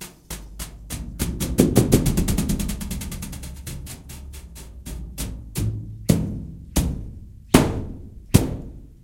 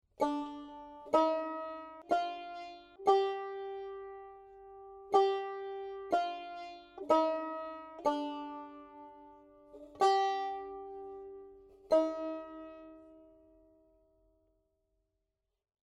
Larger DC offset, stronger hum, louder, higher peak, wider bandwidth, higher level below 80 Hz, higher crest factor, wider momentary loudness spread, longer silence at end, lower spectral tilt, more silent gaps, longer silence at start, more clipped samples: neither; neither; first, -24 LUFS vs -34 LUFS; first, 0 dBFS vs -14 dBFS; first, 17 kHz vs 11.5 kHz; first, -32 dBFS vs -72 dBFS; about the same, 24 dB vs 22 dB; second, 20 LU vs 23 LU; second, 0.1 s vs 2.65 s; first, -5.5 dB/octave vs -4 dB/octave; neither; second, 0 s vs 0.2 s; neither